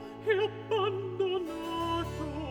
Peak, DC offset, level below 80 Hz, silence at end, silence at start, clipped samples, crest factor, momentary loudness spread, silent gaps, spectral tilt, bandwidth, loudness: -16 dBFS; under 0.1%; -52 dBFS; 0 s; 0 s; under 0.1%; 16 dB; 6 LU; none; -6 dB/octave; 18.5 kHz; -32 LUFS